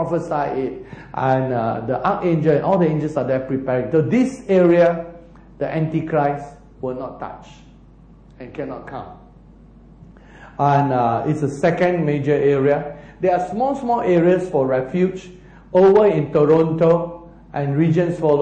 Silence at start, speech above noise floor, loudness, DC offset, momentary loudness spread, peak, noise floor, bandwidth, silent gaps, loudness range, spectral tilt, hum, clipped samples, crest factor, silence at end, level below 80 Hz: 0 s; 28 dB; -18 LUFS; under 0.1%; 16 LU; -4 dBFS; -46 dBFS; 9.2 kHz; none; 11 LU; -8.5 dB/octave; none; under 0.1%; 14 dB; 0 s; -48 dBFS